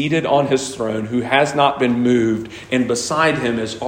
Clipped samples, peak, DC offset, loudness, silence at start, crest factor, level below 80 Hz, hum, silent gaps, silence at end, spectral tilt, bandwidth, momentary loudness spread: under 0.1%; 0 dBFS; under 0.1%; -18 LUFS; 0 s; 16 dB; -52 dBFS; none; none; 0 s; -4.5 dB/octave; 16 kHz; 6 LU